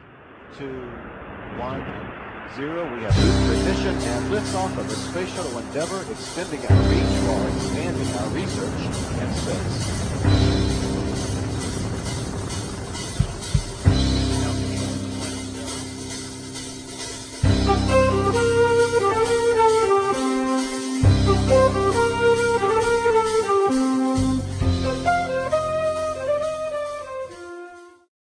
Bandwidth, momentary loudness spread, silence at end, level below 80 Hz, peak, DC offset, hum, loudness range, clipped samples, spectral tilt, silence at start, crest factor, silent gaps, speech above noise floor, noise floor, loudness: 10.5 kHz; 14 LU; 0.3 s; -32 dBFS; -2 dBFS; under 0.1%; none; 6 LU; under 0.1%; -5.5 dB/octave; 0 s; 20 dB; none; 22 dB; -45 dBFS; -22 LUFS